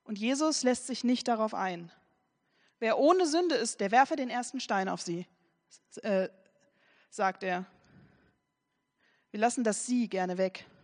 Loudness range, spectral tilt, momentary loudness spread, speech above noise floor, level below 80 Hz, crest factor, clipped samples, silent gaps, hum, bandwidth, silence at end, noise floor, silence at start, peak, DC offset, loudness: 8 LU; -4 dB/octave; 13 LU; 51 dB; -82 dBFS; 22 dB; under 0.1%; none; none; 10 kHz; 0.2 s; -81 dBFS; 0.1 s; -10 dBFS; under 0.1%; -30 LUFS